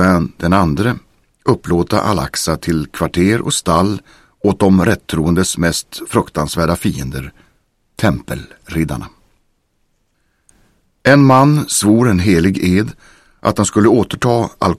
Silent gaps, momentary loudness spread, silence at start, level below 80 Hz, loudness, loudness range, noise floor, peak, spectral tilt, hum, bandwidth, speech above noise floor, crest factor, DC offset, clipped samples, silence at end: none; 11 LU; 0 s; -36 dBFS; -14 LUFS; 10 LU; -62 dBFS; 0 dBFS; -5.5 dB/octave; none; 15.5 kHz; 49 dB; 14 dB; under 0.1%; under 0.1%; 0 s